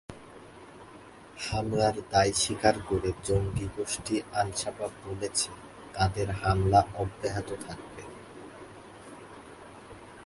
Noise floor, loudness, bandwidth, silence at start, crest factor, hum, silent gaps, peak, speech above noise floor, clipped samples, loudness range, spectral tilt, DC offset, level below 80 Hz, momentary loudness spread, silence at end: -50 dBFS; -29 LUFS; 11.5 kHz; 0.1 s; 22 dB; none; none; -8 dBFS; 21 dB; under 0.1%; 4 LU; -4.5 dB/octave; under 0.1%; -46 dBFS; 23 LU; 0 s